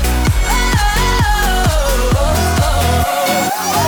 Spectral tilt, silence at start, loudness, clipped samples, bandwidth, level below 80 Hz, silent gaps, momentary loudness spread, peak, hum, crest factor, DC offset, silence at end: -4 dB/octave; 0 s; -14 LUFS; under 0.1%; over 20 kHz; -18 dBFS; none; 1 LU; -4 dBFS; none; 10 dB; under 0.1%; 0 s